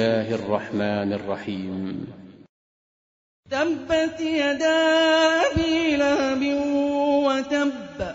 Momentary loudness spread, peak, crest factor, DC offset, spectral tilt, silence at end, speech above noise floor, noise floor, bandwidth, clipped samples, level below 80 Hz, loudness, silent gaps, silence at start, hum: 12 LU; -8 dBFS; 16 dB; under 0.1%; -5 dB/octave; 0 s; over 68 dB; under -90 dBFS; 7.8 kHz; under 0.1%; -48 dBFS; -22 LUFS; 2.49-3.43 s; 0 s; none